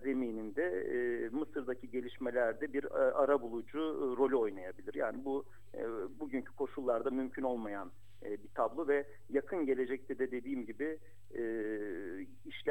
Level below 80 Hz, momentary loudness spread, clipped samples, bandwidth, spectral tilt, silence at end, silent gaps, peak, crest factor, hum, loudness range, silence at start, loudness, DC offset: -70 dBFS; 11 LU; under 0.1%; 10.5 kHz; -7 dB/octave; 0 s; none; -18 dBFS; 18 dB; none; 4 LU; 0 s; -37 LUFS; 0.4%